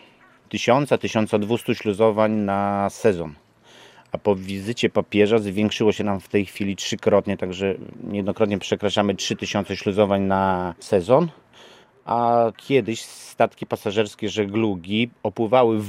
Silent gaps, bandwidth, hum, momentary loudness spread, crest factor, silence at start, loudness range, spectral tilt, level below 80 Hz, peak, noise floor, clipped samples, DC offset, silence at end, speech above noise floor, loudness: none; 15.5 kHz; none; 8 LU; 20 dB; 0.55 s; 2 LU; -5.5 dB/octave; -62 dBFS; -2 dBFS; -53 dBFS; under 0.1%; under 0.1%; 0 s; 31 dB; -22 LUFS